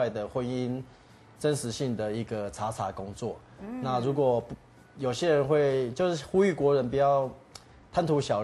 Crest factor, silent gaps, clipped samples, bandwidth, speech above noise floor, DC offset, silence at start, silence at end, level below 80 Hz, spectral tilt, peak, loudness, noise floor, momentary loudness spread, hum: 16 dB; none; under 0.1%; 12.5 kHz; 24 dB; under 0.1%; 0 s; 0 s; -58 dBFS; -6 dB/octave; -12 dBFS; -29 LUFS; -52 dBFS; 13 LU; none